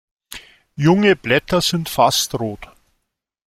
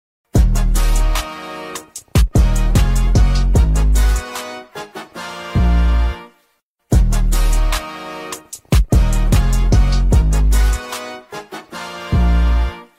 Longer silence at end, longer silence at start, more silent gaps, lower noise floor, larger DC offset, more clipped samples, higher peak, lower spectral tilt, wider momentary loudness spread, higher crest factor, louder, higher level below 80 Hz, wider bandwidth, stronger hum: first, 0.85 s vs 0.15 s; about the same, 0.3 s vs 0.35 s; second, none vs 6.63-6.76 s; first, -75 dBFS vs -63 dBFS; neither; neither; about the same, -2 dBFS vs -4 dBFS; about the same, -4.5 dB/octave vs -5.5 dB/octave; first, 22 LU vs 14 LU; first, 18 dB vs 12 dB; about the same, -17 LUFS vs -17 LUFS; second, -48 dBFS vs -16 dBFS; about the same, 16 kHz vs 16 kHz; neither